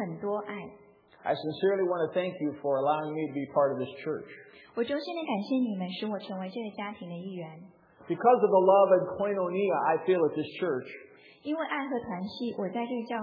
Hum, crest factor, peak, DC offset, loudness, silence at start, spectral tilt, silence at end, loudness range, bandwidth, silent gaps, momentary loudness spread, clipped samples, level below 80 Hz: none; 18 dB; -10 dBFS; under 0.1%; -29 LUFS; 0 s; -9 dB/octave; 0 s; 8 LU; 5.2 kHz; none; 16 LU; under 0.1%; -76 dBFS